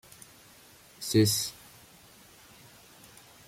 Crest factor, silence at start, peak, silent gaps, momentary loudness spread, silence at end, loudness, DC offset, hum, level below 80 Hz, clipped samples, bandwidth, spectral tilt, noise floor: 22 dB; 1 s; -12 dBFS; none; 28 LU; 1.95 s; -27 LUFS; under 0.1%; none; -66 dBFS; under 0.1%; 16.5 kHz; -4.5 dB/octave; -56 dBFS